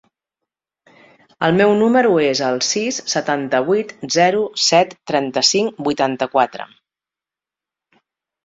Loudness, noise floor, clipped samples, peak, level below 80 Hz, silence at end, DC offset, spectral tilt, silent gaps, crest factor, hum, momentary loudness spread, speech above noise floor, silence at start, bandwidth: -17 LUFS; -88 dBFS; under 0.1%; -2 dBFS; -62 dBFS; 1.8 s; under 0.1%; -3.5 dB/octave; none; 18 dB; none; 7 LU; 72 dB; 1.4 s; 7.8 kHz